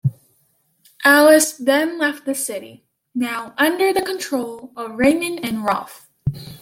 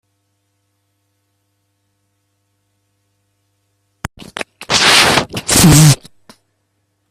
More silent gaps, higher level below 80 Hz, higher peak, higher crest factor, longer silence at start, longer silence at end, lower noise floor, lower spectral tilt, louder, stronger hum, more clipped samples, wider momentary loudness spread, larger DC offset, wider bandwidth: neither; second, -52 dBFS vs -36 dBFS; about the same, 0 dBFS vs 0 dBFS; about the same, 18 dB vs 16 dB; second, 0.05 s vs 4.35 s; second, 0.05 s vs 1.15 s; about the same, -63 dBFS vs -66 dBFS; about the same, -4 dB/octave vs -3.5 dB/octave; second, -18 LUFS vs -9 LUFS; neither; neither; second, 17 LU vs 22 LU; neither; about the same, 17 kHz vs 16.5 kHz